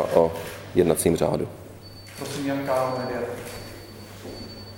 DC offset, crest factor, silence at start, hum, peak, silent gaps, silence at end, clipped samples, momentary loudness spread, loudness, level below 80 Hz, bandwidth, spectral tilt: under 0.1%; 24 dB; 0 s; none; -2 dBFS; none; 0 s; under 0.1%; 20 LU; -25 LUFS; -50 dBFS; 17 kHz; -5.5 dB/octave